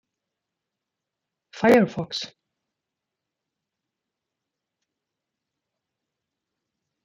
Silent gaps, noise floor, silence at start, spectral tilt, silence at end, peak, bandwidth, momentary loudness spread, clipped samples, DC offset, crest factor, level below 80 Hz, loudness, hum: none; -85 dBFS; 1.55 s; -5.5 dB/octave; 4.75 s; -6 dBFS; 9 kHz; 15 LU; under 0.1%; under 0.1%; 24 dB; -68 dBFS; -21 LUFS; none